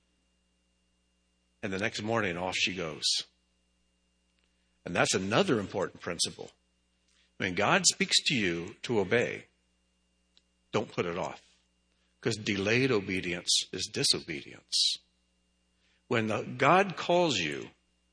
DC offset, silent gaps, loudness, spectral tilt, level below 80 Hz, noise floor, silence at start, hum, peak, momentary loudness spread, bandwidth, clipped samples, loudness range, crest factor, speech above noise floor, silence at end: under 0.1%; none; -29 LUFS; -3 dB/octave; -68 dBFS; -74 dBFS; 1.65 s; 60 Hz at -65 dBFS; -8 dBFS; 13 LU; 10.5 kHz; under 0.1%; 5 LU; 24 dB; 44 dB; 0.45 s